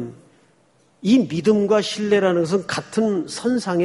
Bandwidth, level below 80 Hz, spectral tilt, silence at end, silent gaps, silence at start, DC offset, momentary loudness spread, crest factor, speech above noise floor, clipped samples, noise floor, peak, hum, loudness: 11.5 kHz; -62 dBFS; -5.5 dB/octave; 0 s; none; 0 s; under 0.1%; 6 LU; 16 dB; 40 dB; under 0.1%; -59 dBFS; -4 dBFS; none; -20 LUFS